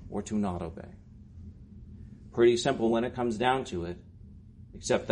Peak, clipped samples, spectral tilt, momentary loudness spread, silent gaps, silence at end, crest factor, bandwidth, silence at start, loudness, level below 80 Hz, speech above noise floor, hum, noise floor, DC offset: -12 dBFS; under 0.1%; -5.5 dB/octave; 24 LU; none; 0 s; 20 dB; 10.5 kHz; 0 s; -29 LUFS; -52 dBFS; 22 dB; none; -50 dBFS; under 0.1%